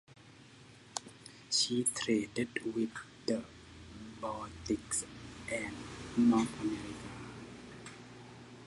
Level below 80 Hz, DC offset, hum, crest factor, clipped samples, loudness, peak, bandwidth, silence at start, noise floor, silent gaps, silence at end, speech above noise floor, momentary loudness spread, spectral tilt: -62 dBFS; under 0.1%; none; 24 dB; under 0.1%; -35 LUFS; -12 dBFS; 11.5 kHz; 0.1 s; -57 dBFS; none; 0 s; 23 dB; 22 LU; -3.5 dB/octave